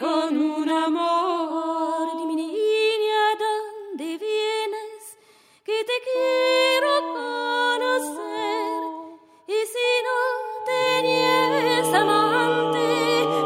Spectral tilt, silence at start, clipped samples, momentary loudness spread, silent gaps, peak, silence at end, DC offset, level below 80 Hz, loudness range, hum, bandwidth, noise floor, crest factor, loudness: -3.5 dB/octave; 0 s; under 0.1%; 11 LU; none; -8 dBFS; 0 s; under 0.1%; -78 dBFS; 5 LU; none; 16 kHz; -56 dBFS; 16 dB; -22 LUFS